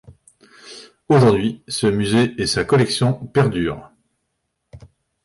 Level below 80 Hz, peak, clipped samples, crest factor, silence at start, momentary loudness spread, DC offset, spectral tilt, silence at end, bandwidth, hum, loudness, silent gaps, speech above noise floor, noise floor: -46 dBFS; -4 dBFS; under 0.1%; 16 dB; 0.65 s; 23 LU; under 0.1%; -6 dB/octave; 0.45 s; 11.5 kHz; none; -18 LUFS; none; 57 dB; -74 dBFS